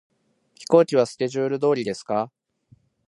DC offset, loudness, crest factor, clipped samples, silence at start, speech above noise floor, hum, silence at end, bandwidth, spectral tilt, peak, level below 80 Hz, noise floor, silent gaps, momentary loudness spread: under 0.1%; -22 LUFS; 20 dB; under 0.1%; 0.6 s; 40 dB; none; 0.8 s; 11.5 kHz; -6 dB/octave; -2 dBFS; -70 dBFS; -62 dBFS; none; 10 LU